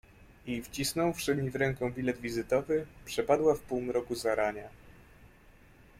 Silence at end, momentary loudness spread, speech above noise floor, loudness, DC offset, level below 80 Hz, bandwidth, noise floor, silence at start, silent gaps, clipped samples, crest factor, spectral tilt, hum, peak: 0.7 s; 11 LU; 27 dB; -32 LUFS; under 0.1%; -56 dBFS; 16.5 kHz; -58 dBFS; 0.45 s; none; under 0.1%; 20 dB; -5 dB/octave; none; -14 dBFS